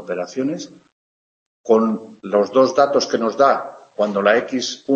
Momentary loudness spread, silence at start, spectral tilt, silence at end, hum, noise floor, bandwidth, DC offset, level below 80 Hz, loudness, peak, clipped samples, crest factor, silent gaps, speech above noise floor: 13 LU; 0 s; -4.5 dB/octave; 0 s; none; under -90 dBFS; 7.8 kHz; under 0.1%; -68 dBFS; -18 LUFS; -2 dBFS; under 0.1%; 18 dB; 0.92-1.64 s; over 72 dB